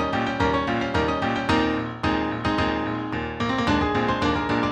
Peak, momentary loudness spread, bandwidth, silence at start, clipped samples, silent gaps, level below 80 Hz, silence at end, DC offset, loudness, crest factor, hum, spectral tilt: -6 dBFS; 4 LU; 9.6 kHz; 0 s; under 0.1%; none; -40 dBFS; 0 s; under 0.1%; -24 LUFS; 18 dB; none; -6 dB/octave